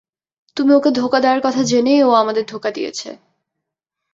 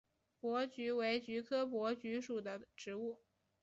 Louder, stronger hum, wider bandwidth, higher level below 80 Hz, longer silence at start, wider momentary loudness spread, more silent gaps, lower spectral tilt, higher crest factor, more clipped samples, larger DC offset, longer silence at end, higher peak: first, -16 LUFS vs -41 LUFS; neither; about the same, 7.8 kHz vs 8 kHz; first, -62 dBFS vs -84 dBFS; about the same, 0.55 s vs 0.45 s; first, 13 LU vs 10 LU; neither; first, -4.5 dB/octave vs -2.5 dB/octave; about the same, 16 dB vs 16 dB; neither; neither; first, 1 s vs 0.45 s; first, -2 dBFS vs -26 dBFS